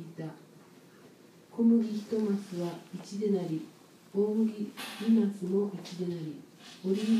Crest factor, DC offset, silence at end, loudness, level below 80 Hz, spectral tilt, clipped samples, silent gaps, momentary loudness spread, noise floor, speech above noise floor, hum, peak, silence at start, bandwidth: 14 dB; under 0.1%; 0 s; -31 LUFS; -84 dBFS; -7 dB/octave; under 0.1%; none; 16 LU; -56 dBFS; 26 dB; none; -16 dBFS; 0 s; 14 kHz